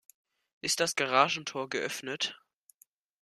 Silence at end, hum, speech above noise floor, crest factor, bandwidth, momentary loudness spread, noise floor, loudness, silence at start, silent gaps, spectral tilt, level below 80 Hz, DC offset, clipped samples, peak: 0.85 s; none; 37 dB; 26 dB; 15 kHz; 9 LU; -67 dBFS; -30 LUFS; 0.65 s; none; -1.5 dB/octave; -78 dBFS; under 0.1%; under 0.1%; -8 dBFS